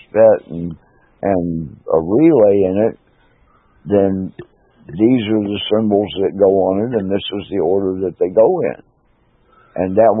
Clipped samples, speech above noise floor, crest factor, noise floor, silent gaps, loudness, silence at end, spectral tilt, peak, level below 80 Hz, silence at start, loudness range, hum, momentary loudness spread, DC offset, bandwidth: under 0.1%; 42 dB; 16 dB; -57 dBFS; none; -16 LUFS; 0 s; -12 dB/octave; 0 dBFS; -52 dBFS; 0.15 s; 2 LU; none; 14 LU; under 0.1%; 3.9 kHz